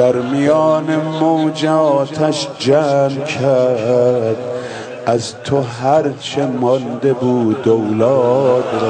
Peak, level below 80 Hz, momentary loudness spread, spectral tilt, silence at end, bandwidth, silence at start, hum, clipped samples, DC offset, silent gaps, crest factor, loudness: -2 dBFS; -58 dBFS; 6 LU; -6.5 dB/octave; 0 s; 9.4 kHz; 0 s; none; under 0.1%; under 0.1%; none; 14 dB; -15 LUFS